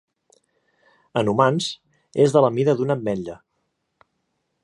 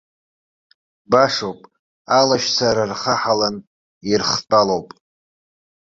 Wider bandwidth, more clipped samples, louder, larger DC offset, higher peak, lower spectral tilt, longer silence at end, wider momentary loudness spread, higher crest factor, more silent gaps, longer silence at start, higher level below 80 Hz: first, 11.5 kHz vs 7.8 kHz; neither; second, -21 LUFS vs -18 LUFS; neither; about the same, -2 dBFS vs -2 dBFS; first, -6 dB/octave vs -3.5 dB/octave; first, 1.3 s vs 1 s; first, 13 LU vs 9 LU; about the same, 22 dB vs 18 dB; second, none vs 1.79-2.05 s, 3.67-4.01 s; about the same, 1.15 s vs 1.1 s; second, -62 dBFS vs -54 dBFS